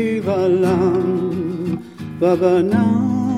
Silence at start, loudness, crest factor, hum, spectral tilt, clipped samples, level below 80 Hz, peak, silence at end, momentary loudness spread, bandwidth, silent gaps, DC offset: 0 s; -18 LUFS; 14 dB; none; -8.5 dB/octave; under 0.1%; -56 dBFS; -2 dBFS; 0 s; 9 LU; 12 kHz; none; under 0.1%